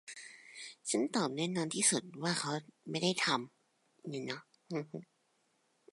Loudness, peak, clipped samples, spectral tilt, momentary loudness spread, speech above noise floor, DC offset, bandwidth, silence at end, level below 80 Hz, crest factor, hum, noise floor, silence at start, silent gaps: -35 LUFS; -16 dBFS; under 0.1%; -3 dB/octave; 19 LU; 41 dB; under 0.1%; 11.5 kHz; 0.9 s; -86 dBFS; 20 dB; none; -76 dBFS; 0.05 s; none